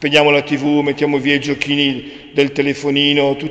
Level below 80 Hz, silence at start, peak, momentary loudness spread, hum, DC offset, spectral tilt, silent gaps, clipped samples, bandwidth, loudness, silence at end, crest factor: -52 dBFS; 0 s; 0 dBFS; 6 LU; none; under 0.1%; -5 dB/octave; none; under 0.1%; 8.4 kHz; -15 LUFS; 0 s; 16 dB